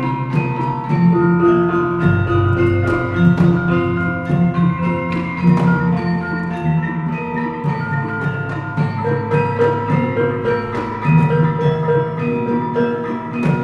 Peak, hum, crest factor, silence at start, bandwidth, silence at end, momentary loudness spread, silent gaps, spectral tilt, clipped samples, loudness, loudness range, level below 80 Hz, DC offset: -2 dBFS; none; 14 dB; 0 s; 5.6 kHz; 0 s; 7 LU; none; -9.5 dB/octave; under 0.1%; -17 LUFS; 4 LU; -42 dBFS; under 0.1%